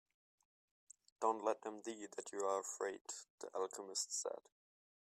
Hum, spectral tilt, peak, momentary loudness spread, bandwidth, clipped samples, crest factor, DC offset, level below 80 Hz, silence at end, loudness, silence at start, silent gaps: none; -1 dB/octave; -22 dBFS; 10 LU; 15.5 kHz; under 0.1%; 22 dB; under 0.1%; under -90 dBFS; 0.8 s; -43 LUFS; 1.2 s; 3.01-3.05 s, 3.30-3.38 s